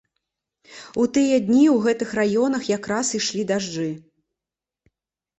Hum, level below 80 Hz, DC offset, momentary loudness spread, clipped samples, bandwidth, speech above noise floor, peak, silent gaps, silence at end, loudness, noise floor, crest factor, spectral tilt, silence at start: none; -62 dBFS; under 0.1%; 13 LU; under 0.1%; 8.2 kHz; 68 dB; -6 dBFS; none; 1.4 s; -21 LUFS; -88 dBFS; 16 dB; -4.5 dB/octave; 0.7 s